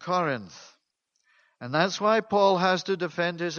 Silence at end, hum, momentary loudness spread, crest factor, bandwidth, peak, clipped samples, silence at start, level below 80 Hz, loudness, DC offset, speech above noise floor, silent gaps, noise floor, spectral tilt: 0 s; none; 12 LU; 20 dB; 7 kHz; -8 dBFS; under 0.1%; 0 s; -70 dBFS; -25 LUFS; under 0.1%; 51 dB; none; -76 dBFS; -5 dB/octave